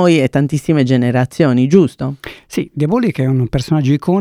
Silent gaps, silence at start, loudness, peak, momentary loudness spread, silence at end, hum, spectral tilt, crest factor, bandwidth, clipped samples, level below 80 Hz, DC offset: none; 0 s; -15 LUFS; 0 dBFS; 11 LU; 0 s; none; -7.5 dB/octave; 14 dB; 15 kHz; 0.1%; -42 dBFS; under 0.1%